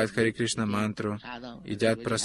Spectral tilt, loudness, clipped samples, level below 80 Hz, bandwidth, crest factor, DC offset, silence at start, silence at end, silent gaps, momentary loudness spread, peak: -4.5 dB/octave; -29 LUFS; under 0.1%; -58 dBFS; 12.5 kHz; 18 dB; under 0.1%; 0 s; 0 s; none; 12 LU; -10 dBFS